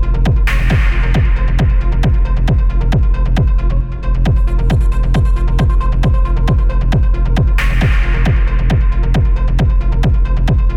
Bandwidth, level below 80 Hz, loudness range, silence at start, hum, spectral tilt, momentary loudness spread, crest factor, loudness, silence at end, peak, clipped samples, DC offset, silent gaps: 6.4 kHz; -12 dBFS; 1 LU; 0 s; none; -7.5 dB/octave; 1 LU; 10 dB; -15 LUFS; 0 s; -2 dBFS; under 0.1%; 0.5%; none